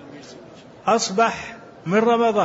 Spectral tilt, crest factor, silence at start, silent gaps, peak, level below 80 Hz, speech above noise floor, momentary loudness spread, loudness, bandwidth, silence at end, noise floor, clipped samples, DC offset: -4 dB/octave; 16 dB; 0 s; none; -6 dBFS; -60 dBFS; 24 dB; 22 LU; -20 LUFS; 8 kHz; 0 s; -43 dBFS; under 0.1%; under 0.1%